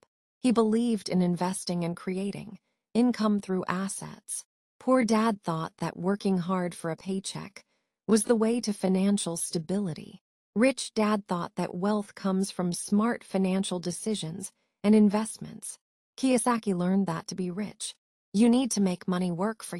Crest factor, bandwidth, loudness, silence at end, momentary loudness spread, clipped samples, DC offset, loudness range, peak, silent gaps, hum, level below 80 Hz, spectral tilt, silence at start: 20 dB; 13.5 kHz; -28 LUFS; 0 s; 12 LU; under 0.1%; under 0.1%; 2 LU; -8 dBFS; 4.45-4.80 s, 10.21-10.53 s, 15.81-16.13 s, 17.98-18.32 s; none; -68 dBFS; -5.5 dB/octave; 0.45 s